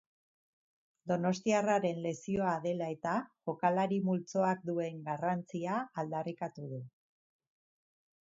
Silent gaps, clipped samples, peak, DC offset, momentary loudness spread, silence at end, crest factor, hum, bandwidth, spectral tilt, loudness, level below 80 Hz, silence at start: none; under 0.1%; -16 dBFS; under 0.1%; 11 LU; 1.4 s; 20 dB; none; 7.4 kHz; -6 dB/octave; -34 LUFS; -74 dBFS; 1.05 s